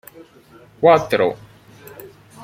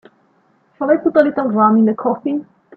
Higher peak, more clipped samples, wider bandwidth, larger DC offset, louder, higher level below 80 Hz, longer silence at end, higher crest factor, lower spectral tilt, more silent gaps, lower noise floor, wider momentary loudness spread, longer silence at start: about the same, -2 dBFS vs 0 dBFS; neither; first, 16 kHz vs 4.4 kHz; neither; about the same, -16 LUFS vs -16 LUFS; first, -58 dBFS vs -64 dBFS; second, 0 s vs 0.35 s; about the same, 20 dB vs 16 dB; second, -6 dB/octave vs -10 dB/octave; neither; second, -48 dBFS vs -57 dBFS; first, 26 LU vs 11 LU; about the same, 0.8 s vs 0.8 s